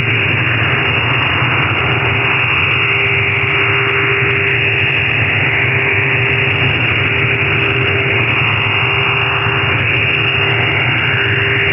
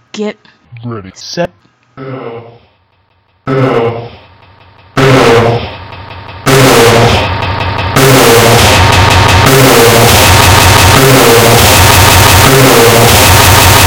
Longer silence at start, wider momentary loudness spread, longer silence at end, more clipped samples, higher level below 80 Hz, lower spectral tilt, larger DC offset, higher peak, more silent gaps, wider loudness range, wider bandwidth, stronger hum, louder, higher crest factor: second, 0 s vs 0.15 s; second, 1 LU vs 20 LU; about the same, 0 s vs 0 s; second, under 0.1% vs 10%; second, -40 dBFS vs -22 dBFS; first, -8 dB/octave vs -3.5 dB/octave; neither; second, -4 dBFS vs 0 dBFS; neither; second, 0 LU vs 14 LU; second, 5.6 kHz vs over 20 kHz; neither; second, -12 LUFS vs -4 LUFS; about the same, 10 dB vs 6 dB